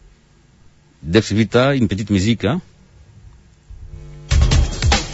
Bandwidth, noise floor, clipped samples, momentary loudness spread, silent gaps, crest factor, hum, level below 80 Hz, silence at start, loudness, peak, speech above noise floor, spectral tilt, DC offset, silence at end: 8 kHz; -51 dBFS; under 0.1%; 23 LU; none; 18 dB; none; -26 dBFS; 1.05 s; -17 LUFS; -2 dBFS; 35 dB; -5.5 dB/octave; under 0.1%; 0 s